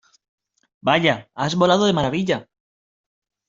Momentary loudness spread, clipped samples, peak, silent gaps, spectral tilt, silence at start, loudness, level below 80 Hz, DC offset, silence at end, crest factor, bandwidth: 8 LU; under 0.1%; -2 dBFS; none; -5 dB/octave; 0.85 s; -20 LUFS; -56 dBFS; under 0.1%; 1.05 s; 20 dB; 7.6 kHz